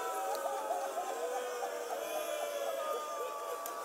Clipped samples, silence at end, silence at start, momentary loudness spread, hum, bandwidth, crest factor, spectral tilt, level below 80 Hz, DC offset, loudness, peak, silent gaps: under 0.1%; 0 s; 0 s; 3 LU; none; 16 kHz; 16 dB; 0 dB/octave; -88 dBFS; under 0.1%; -38 LUFS; -22 dBFS; none